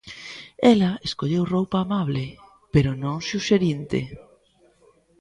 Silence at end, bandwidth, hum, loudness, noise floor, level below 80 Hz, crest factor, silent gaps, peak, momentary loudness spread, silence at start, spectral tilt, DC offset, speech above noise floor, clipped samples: 1 s; 11 kHz; none; -23 LUFS; -59 dBFS; -48 dBFS; 22 dB; none; -2 dBFS; 18 LU; 0.05 s; -6.5 dB/octave; under 0.1%; 38 dB; under 0.1%